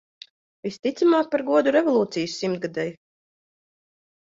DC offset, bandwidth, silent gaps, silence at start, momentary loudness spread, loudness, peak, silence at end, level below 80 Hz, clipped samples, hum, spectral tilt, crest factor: under 0.1%; 7.8 kHz; 0.79-0.83 s; 0.65 s; 12 LU; -23 LUFS; -8 dBFS; 1.4 s; -70 dBFS; under 0.1%; none; -5.5 dB/octave; 16 dB